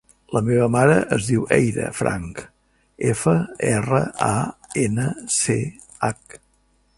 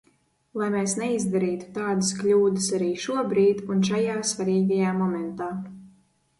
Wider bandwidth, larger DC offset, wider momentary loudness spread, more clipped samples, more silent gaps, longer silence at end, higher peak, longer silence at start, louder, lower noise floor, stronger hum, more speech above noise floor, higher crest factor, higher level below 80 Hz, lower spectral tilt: about the same, 11.5 kHz vs 11.5 kHz; neither; about the same, 10 LU vs 9 LU; neither; neither; about the same, 0.6 s vs 0.5 s; first, 0 dBFS vs -10 dBFS; second, 0.3 s vs 0.55 s; first, -21 LUFS vs -24 LUFS; second, -62 dBFS vs -66 dBFS; neither; about the same, 42 dB vs 42 dB; first, 20 dB vs 14 dB; first, -48 dBFS vs -64 dBFS; about the same, -5.5 dB/octave vs -5 dB/octave